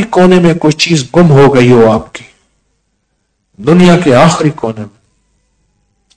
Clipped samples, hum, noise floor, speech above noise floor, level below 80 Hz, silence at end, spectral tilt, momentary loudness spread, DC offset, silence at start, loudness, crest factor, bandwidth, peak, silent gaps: 6%; none; -62 dBFS; 56 dB; -38 dBFS; 1.3 s; -6 dB/octave; 16 LU; under 0.1%; 0 s; -7 LUFS; 8 dB; 11 kHz; 0 dBFS; none